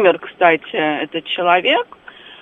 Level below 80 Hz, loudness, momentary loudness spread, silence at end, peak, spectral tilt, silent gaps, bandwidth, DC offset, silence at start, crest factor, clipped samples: -66 dBFS; -16 LUFS; 8 LU; 0.1 s; 0 dBFS; -6.5 dB/octave; none; 3.9 kHz; under 0.1%; 0 s; 18 dB; under 0.1%